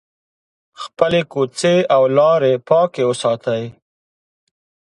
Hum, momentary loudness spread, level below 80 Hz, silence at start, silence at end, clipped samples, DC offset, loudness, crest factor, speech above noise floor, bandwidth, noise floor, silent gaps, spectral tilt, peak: none; 11 LU; -60 dBFS; 0.8 s; 1.25 s; under 0.1%; under 0.1%; -16 LUFS; 18 dB; over 74 dB; 11 kHz; under -90 dBFS; none; -5.5 dB/octave; 0 dBFS